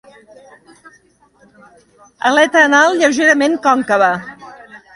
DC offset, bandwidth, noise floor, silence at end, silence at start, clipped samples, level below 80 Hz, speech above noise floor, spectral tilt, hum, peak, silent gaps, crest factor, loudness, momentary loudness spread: under 0.1%; 11.5 kHz; -52 dBFS; 0.2 s; 2.25 s; under 0.1%; -62 dBFS; 40 dB; -3 dB/octave; none; 0 dBFS; none; 16 dB; -12 LUFS; 8 LU